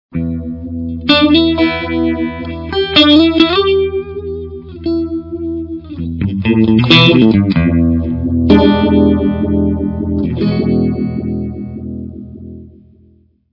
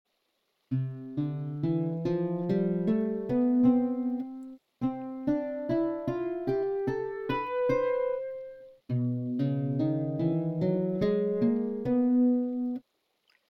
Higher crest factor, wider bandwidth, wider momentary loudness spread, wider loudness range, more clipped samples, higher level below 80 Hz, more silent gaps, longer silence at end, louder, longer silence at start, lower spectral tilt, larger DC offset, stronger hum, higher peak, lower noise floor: about the same, 14 dB vs 16 dB; about the same, 6 kHz vs 5.8 kHz; first, 17 LU vs 10 LU; first, 7 LU vs 3 LU; first, 0.3% vs under 0.1%; first, -34 dBFS vs -62 dBFS; neither; first, 0.85 s vs 0.7 s; first, -12 LUFS vs -29 LUFS; second, 0.15 s vs 0.7 s; second, -7.5 dB/octave vs -10.5 dB/octave; neither; neither; first, 0 dBFS vs -14 dBFS; second, -49 dBFS vs -77 dBFS